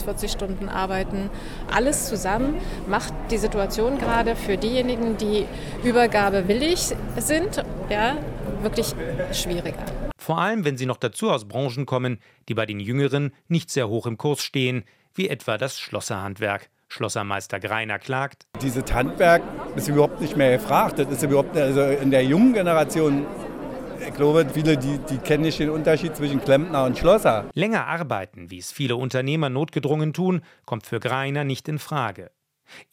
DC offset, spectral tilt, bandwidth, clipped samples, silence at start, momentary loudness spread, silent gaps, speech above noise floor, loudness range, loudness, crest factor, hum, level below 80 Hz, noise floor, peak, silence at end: under 0.1%; -5 dB/octave; 16.5 kHz; under 0.1%; 0 s; 11 LU; none; 27 dB; 6 LU; -23 LUFS; 18 dB; none; -38 dBFS; -49 dBFS; -6 dBFS; 0.1 s